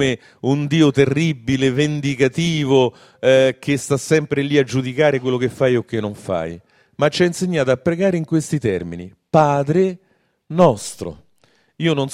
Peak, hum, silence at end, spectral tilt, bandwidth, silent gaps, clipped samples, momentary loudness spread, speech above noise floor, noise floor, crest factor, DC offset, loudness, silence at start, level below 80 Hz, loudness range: 0 dBFS; none; 0 s; -6 dB/octave; 15 kHz; none; under 0.1%; 10 LU; 42 dB; -59 dBFS; 18 dB; under 0.1%; -18 LUFS; 0 s; -52 dBFS; 3 LU